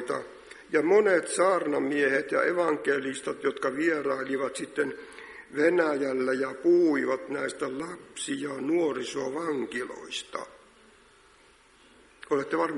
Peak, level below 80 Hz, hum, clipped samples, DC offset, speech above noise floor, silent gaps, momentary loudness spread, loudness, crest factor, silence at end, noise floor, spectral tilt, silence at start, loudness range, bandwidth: -10 dBFS; -70 dBFS; none; under 0.1%; under 0.1%; 31 dB; none; 14 LU; -28 LUFS; 18 dB; 0 s; -58 dBFS; -4 dB/octave; 0 s; 8 LU; 11.5 kHz